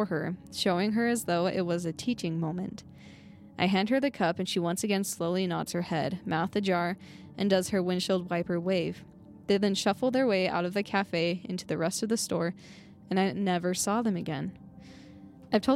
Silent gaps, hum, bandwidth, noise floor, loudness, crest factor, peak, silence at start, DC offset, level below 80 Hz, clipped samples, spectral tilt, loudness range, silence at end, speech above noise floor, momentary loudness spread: none; none; 16 kHz; -50 dBFS; -29 LUFS; 18 dB; -12 dBFS; 0 s; under 0.1%; -64 dBFS; under 0.1%; -5 dB/octave; 2 LU; 0 s; 21 dB; 10 LU